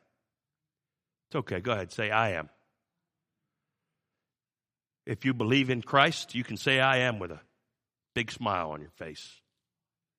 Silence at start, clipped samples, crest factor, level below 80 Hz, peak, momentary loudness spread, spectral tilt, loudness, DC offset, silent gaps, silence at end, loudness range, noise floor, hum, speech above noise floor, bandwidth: 1.3 s; under 0.1%; 26 dB; -68 dBFS; -6 dBFS; 19 LU; -5 dB/octave; -28 LUFS; under 0.1%; none; 0.9 s; 8 LU; under -90 dBFS; none; over 61 dB; 15 kHz